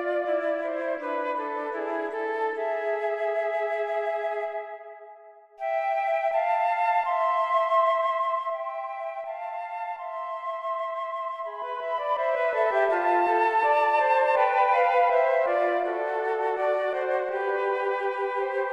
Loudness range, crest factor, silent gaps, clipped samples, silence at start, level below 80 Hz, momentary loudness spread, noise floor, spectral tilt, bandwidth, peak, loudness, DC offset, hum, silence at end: 8 LU; 16 dB; none; under 0.1%; 0 s; -80 dBFS; 12 LU; -50 dBFS; -3 dB/octave; 8.6 kHz; -10 dBFS; -26 LUFS; under 0.1%; none; 0 s